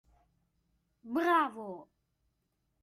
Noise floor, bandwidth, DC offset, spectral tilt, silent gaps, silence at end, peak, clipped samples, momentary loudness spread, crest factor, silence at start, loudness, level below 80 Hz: -80 dBFS; 15.5 kHz; under 0.1%; -5 dB/octave; none; 1 s; -18 dBFS; under 0.1%; 18 LU; 20 dB; 1.05 s; -31 LUFS; -76 dBFS